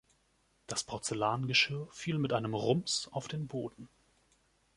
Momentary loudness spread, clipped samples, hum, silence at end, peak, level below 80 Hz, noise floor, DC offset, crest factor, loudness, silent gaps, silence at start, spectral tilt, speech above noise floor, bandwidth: 11 LU; under 0.1%; none; 0.9 s; -14 dBFS; -68 dBFS; -73 dBFS; under 0.1%; 22 dB; -33 LUFS; none; 0.7 s; -4 dB/octave; 39 dB; 11.5 kHz